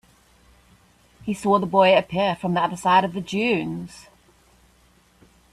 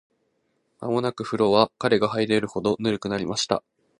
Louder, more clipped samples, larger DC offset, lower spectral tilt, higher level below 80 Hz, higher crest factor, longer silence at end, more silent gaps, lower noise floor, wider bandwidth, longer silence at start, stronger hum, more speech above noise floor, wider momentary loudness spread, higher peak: first, -21 LUFS vs -24 LUFS; neither; neither; about the same, -5.5 dB/octave vs -5 dB/octave; about the same, -58 dBFS vs -58 dBFS; about the same, 20 dB vs 22 dB; first, 1.55 s vs 0.4 s; neither; second, -58 dBFS vs -71 dBFS; first, 13.5 kHz vs 11 kHz; first, 1.25 s vs 0.8 s; neither; second, 37 dB vs 48 dB; first, 15 LU vs 7 LU; about the same, -4 dBFS vs -2 dBFS